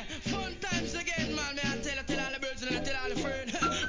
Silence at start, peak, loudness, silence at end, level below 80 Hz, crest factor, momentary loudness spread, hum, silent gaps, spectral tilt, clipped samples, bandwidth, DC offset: 0 s; -16 dBFS; -33 LUFS; 0 s; -48 dBFS; 18 dB; 3 LU; none; none; -3.5 dB/octave; under 0.1%; 7.6 kHz; 0.2%